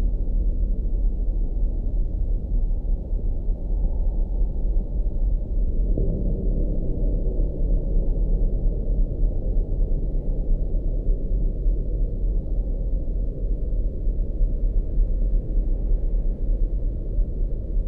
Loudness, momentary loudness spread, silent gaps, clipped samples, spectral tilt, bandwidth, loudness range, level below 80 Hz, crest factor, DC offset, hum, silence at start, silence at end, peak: -28 LUFS; 3 LU; none; under 0.1%; -13 dB/octave; 0.9 kHz; 2 LU; -22 dBFS; 12 dB; under 0.1%; none; 0 s; 0 s; -10 dBFS